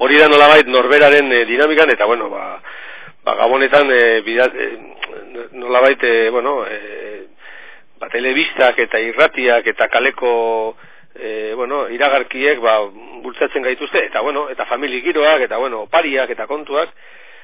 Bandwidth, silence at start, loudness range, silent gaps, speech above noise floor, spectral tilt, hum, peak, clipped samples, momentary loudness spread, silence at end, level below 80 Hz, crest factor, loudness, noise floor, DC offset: 4 kHz; 0 s; 5 LU; none; 26 dB; -6.5 dB/octave; none; 0 dBFS; 0.2%; 19 LU; 0.55 s; -60 dBFS; 16 dB; -14 LUFS; -40 dBFS; 1%